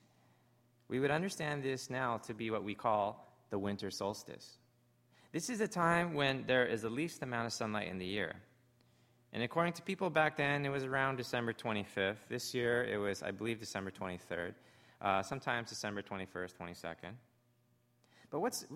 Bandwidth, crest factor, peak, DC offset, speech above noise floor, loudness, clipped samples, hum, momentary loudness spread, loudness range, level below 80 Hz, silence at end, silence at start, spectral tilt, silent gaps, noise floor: 16 kHz; 22 dB; -16 dBFS; under 0.1%; 36 dB; -37 LUFS; under 0.1%; none; 12 LU; 5 LU; -72 dBFS; 0 s; 0.9 s; -4.5 dB/octave; none; -74 dBFS